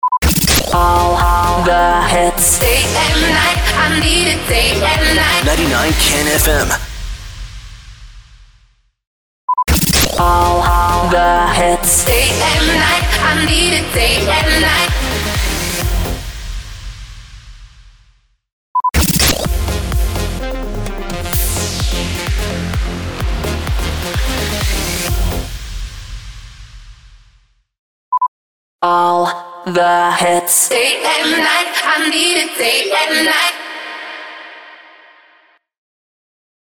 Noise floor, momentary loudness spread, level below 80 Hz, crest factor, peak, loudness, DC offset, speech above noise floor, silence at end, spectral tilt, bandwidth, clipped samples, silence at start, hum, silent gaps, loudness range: -53 dBFS; 16 LU; -22 dBFS; 14 dB; -2 dBFS; -13 LUFS; under 0.1%; 40 dB; 2 s; -3 dB/octave; over 20 kHz; under 0.1%; 0.05 s; none; 9.07-9.48 s, 18.52-18.75 s, 27.79-28.12 s, 28.28-28.79 s; 10 LU